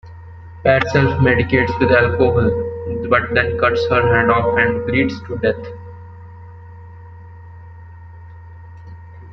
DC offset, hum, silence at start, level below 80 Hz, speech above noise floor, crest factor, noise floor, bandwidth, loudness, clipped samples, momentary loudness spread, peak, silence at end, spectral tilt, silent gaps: under 0.1%; none; 0.05 s; -42 dBFS; 22 dB; 16 dB; -37 dBFS; 6.8 kHz; -16 LUFS; under 0.1%; 24 LU; -2 dBFS; 0 s; -7.5 dB/octave; none